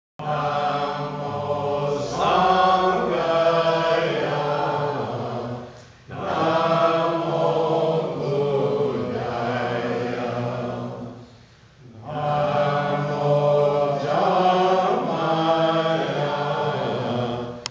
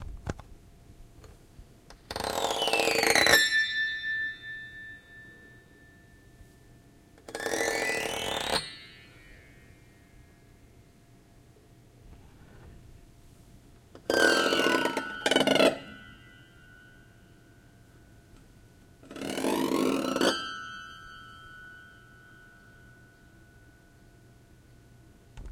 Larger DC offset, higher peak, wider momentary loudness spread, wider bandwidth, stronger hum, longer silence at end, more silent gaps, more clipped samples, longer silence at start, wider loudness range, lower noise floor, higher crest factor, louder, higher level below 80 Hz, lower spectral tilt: neither; about the same, -6 dBFS vs -6 dBFS; second, 10 LU vs 25 LU; second, 8 kHz vs 17 kHz; neither; about the same, 0 s vs 0 s; neither; neither; first, 0.2 s vs 0 s; second, 6 LU vs 15 LU; second, -49 dBFS vs -57 dBFS; second, 16 dB vs 28 dB; first, -22 LUFS vs -27 LUFS; about the same, -56 dBFS vs -56 dBFS; first, -6.5 dB/octave vs -2.5 dB/octave